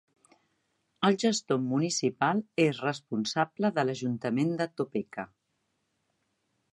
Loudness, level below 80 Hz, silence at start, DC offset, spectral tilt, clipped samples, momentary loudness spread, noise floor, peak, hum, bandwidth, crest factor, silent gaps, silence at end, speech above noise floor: -29 LUFS; -76 dBFS; 1 s; under 0.1%; -5 dB/octave; under 0.1%; 7 LU; -78 dBFS; -12 dBFS; none; 11.5 kHz; 18 dB; none; 1.5 s; 49 dB